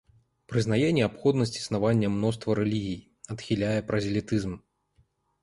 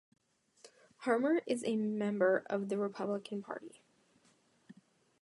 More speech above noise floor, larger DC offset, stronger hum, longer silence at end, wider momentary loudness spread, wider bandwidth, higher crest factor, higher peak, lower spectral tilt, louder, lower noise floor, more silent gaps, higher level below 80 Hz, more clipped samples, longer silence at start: first, 41 dB vs 37 dB; neither; neither; first, 0.85 s vs 0.5 s; about the same, 12 LU vs 12 LU; about the same, 11.5 kHz vs 11.5 kHz; about the same, 18 dB vs 20 dB; first, -10 dBFS vs -16 dBFS; about the same, -6.5 dB/octave vs -6 dB/octave; first, -27 LUFS vs -35 LUFS; about the same, -68 dBFS vs -71 dBFS; neither; first, -54 dBFS vs -88 dBFS; neither; second, 0.5 s vs 0.65 s